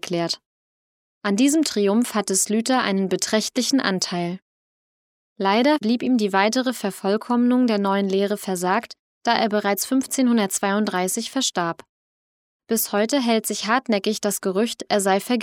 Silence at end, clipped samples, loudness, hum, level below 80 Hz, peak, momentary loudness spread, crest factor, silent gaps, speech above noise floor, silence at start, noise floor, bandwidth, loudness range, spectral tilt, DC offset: 0 s; under 0.1%; -21 LUFS; none; -74 dBFS; -2 dBFS; 7 LU; 20 dB; 0.46-1.21 s, 4.42-5.36 s, 8.99-9.21 s, 11.89-12.60 s; over 69 dB; 0.05 s; under -90 dBFS; 17 kHz; 3 LU; -3.5 dB/octave; under 0.1%